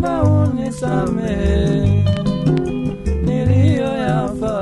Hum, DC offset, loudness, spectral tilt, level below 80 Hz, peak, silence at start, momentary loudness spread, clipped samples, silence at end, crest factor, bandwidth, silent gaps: none; under 0.1%; -17 LUFS; -8 dB/octave; -28 dBFS; -2 dBFS; 0 s; 6 LU; under 0.1%; 0 s; 14 dB; 11 kHz; none